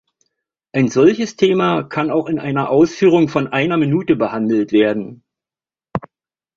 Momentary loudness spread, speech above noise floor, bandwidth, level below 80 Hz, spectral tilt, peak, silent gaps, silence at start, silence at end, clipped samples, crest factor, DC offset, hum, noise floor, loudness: 12 LU; over 75 dB; 7.4 kHz; -54 dBFS; -6.5 dB/octave; -2 dBFS; none; 0.75 s; 0.6 s; under 0.1%; 16 dB; under 0.1%; none; under -90 dBFS; -16 LUFS